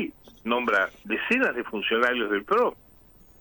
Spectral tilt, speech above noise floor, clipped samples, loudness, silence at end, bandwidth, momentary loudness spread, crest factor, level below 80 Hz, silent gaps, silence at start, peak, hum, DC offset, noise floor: -4.5 dB/octave; 29 dB; under 0.1%; -25 LUFS; 0.65 s; over 20 kHz; 6 LU; 18 dB; -60 dBFS; none; 0 s; -10 dBFS; none; under 0.1%; -54 dBFS